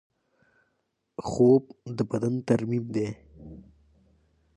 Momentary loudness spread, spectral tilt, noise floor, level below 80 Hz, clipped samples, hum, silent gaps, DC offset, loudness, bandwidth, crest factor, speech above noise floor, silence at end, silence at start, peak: 25 LU; -8 dB/octave; -77 dBFS; -58 dBFS; under 0.1%; none; none; under 0.1%; -26 LUFS; 10.5 kHz; 20 dB; 52 dB; 0.95 s; 1.2 s; -10 dBFS